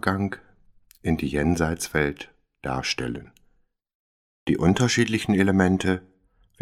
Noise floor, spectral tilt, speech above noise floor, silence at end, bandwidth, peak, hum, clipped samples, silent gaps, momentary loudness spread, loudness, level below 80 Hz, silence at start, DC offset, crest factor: -65 dBFS; -5.5 dB/octave; 42 dB; 0.6 s; 15 kHz; -4 dBFS; none; under 0.1%; 3.95-4.46 s; 15 LU; -24 LUFS; -44 dBFS; 0.05 s; under 0.1%; 20 dB